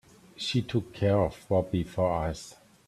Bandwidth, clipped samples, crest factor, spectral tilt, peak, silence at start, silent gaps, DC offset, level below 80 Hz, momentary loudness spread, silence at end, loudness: 13 kHz; under 0.1%; 18 dB; -6.5 dB/octave; -12 dBFS; 0.4 s; none; under 0.1%; -50 dBFS; 9 LU; 0.35 s; -29 LUFS